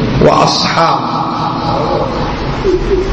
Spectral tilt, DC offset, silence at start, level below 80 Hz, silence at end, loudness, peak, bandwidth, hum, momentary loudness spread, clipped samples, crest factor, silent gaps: -5.5 dB/octave; under 0.1%; 0 s; -24 dBFS; 0 s; -12 LUFS; 0 dBFS; 8.8 kHz; none; 7 LU; under 0.1%; 12 dB; none